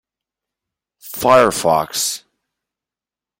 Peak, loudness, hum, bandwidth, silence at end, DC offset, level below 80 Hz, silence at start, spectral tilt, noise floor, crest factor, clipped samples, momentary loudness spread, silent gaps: 0 dBFS; -15 LUFS; none; 17 kHz; 1.2 s; under 0.1%; -54 dBFS; 1.05 s; -3 dB/octave; -89 dBFS; 20 dB; under 0.1%; 15 LU; none